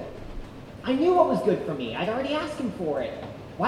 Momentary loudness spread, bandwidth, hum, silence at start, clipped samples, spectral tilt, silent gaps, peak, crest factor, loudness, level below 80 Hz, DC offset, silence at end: 20 LU; 12.5 kHz; none; 0 s; under 0.1%; -6.5 dB/octave; none; -6 dBFS; 20 dB; -26 LUFS; -48 dBFS; under 0.1%; 0 s